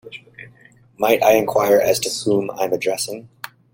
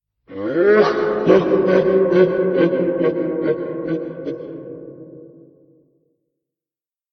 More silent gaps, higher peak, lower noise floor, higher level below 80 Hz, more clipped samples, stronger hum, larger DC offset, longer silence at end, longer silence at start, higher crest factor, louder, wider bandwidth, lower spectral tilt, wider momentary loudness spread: neither; about the same, -2 dBFS vs 0 dBFS; second, -50 dBFS vs under -90 dBFS; about the same, -58 dBFS vs -58 dBFS; neither; neither; neither; second, 0.45 s vs 1.85 s; second, 0.05 s vs 0.3 s; about the same, 18 dB vs 18 dB; about the same, -18 LUFS vs -17 LUFS; first, 17 kHz vs 6.4 kHz; second, -3.5 dB/octave vs -8.5 dB/octave; first, 22 LU vs 19 LU